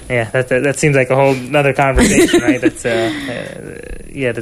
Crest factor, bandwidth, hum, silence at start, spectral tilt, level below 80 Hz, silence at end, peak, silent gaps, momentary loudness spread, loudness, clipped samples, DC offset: 14 dB; 13.5 kHz; none; 0 s; -5 dB/octave; -30 dBFS; 0 s; 0 dBFS; none; 17 LU; -14 LUFS; under 0.1%; under 0.1%